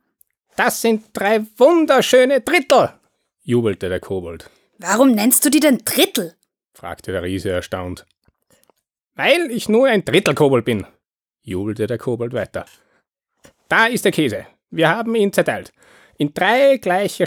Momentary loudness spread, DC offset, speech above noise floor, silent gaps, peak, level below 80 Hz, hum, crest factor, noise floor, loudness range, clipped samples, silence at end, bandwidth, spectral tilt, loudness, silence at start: 16 LU; under 0.1%; 55 dB; 9.02-9.07 s; -2 dBFS; -54 dBFS; none; 16 dB; -72 dBFS; 7 LU; under 0.1%; 0 s; over 20 kHz; -4 dB/octave; -17 LUFS; 0.6 s